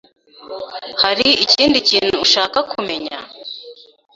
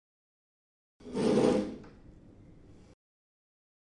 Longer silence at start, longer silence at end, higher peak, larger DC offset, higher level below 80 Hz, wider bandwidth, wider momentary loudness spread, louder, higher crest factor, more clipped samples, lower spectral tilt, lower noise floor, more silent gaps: second, 0.4 s vs 1.05 s; second, 0.4 s vs 2.05 s; first, 0 dBFS vs -14 dBFS; neither; first, -52 dBFS vs -60 dBFS; second, 8 kHz vs 11 kHz; first, 19 LU vs 15 LU; first, -14 LUFS vs -30 LUFS; about the same, 18 dB vs 22 dB; neither; second, -2 dB/octave vs -6.5 dB/octave; second, -39 dBFS vs -55 dBFS; neither